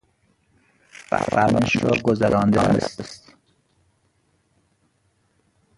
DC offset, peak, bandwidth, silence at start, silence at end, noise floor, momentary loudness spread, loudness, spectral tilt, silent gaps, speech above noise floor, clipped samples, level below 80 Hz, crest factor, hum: under 0.1%; -2 dBFS; 11.5 kHz; 1.1 s; 2.6 s; -66 dBFS; 16 LU; -20 LUFS; -6.5 dB/octave; none; 47 dB; under 0.1%; -48 dBFS; 22 dB; none